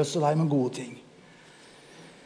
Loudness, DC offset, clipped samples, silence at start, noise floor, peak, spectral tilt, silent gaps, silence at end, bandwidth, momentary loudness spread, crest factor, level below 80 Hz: -27 LUFS; under 0.1%; under 0.1%; 0 s; -53 dBFS; -12 dBFS; -6.5 dB/octave; none; 0.15 s; 10.5 kHz; 25 LU; 18 dB; -76 dBFS